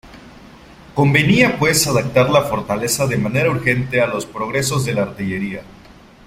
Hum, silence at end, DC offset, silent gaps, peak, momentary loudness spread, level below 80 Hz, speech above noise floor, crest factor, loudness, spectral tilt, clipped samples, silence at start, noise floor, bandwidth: none; 0.35 s; under 0.1%; none; 0 dBFS; 10 LU; -44 dBFS; 27 dB; 18 dB; -17 LUFS; -4.5 dB/octave; under 0.1%; 0.05 s; -43 dBFS; 16 kHz